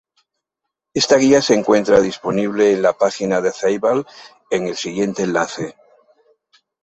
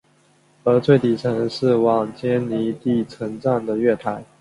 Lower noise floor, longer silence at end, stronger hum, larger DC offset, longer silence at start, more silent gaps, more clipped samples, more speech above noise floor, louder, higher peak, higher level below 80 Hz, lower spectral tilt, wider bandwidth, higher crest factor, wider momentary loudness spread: first, -81 dBFS vs -58 dBFS; first, 1.15 s vs 0.15 s; neither; neither; first, 0.95 s vs 0.65 s; neither; neither; first, 64 dB vs 38 dB; first, -17 LUFS vs -20 LUFS; about the same, -2 dBFS vs -2 dBFS; about the same, -56 dBFS vs -58 dBFS; second, -4.5 dB/octave vs -8 dB/octave; second, 8.2 kHz vs 11.5 kHz; about the same, 18 dB vs 18 dB; about the same, 10 LU vs 8 LU